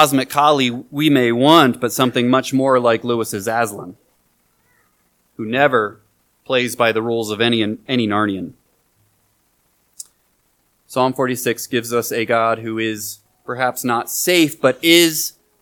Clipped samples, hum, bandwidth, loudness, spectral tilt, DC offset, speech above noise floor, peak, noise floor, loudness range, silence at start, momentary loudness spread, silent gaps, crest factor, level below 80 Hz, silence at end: under 0.1%; none; 19 kHz; -17 LUFS; -4 dB/octave; under 0.1%; 46 dB; 0 dBFS; -63 dBFS; 9 LU; 0 s; 15 LU; none; 18 dB; -64 dBFS; 0.3 s